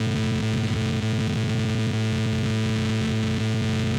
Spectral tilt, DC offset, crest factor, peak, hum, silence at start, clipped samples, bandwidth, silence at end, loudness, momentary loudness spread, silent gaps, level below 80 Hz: -6 dB/octave; under 0.1%; 10 dB; -14 dBFS; none; 0 s; under 0.1%; 12.5 kHz; 0 s; -24 LUFS; 0 LU; none; -44 dBFS